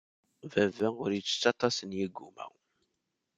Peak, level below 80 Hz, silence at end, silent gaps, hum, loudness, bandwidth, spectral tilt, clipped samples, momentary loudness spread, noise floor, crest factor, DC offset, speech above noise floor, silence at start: -10 dBFS; -76 dBFS; 0.9 s; none; none; -31 LUFS; 9.4 kHz; -4 dB/octave; under 0.1%; 19 LU; -83 dBFS; 22 dB; under 0.1%; 51 dB; 0.45 s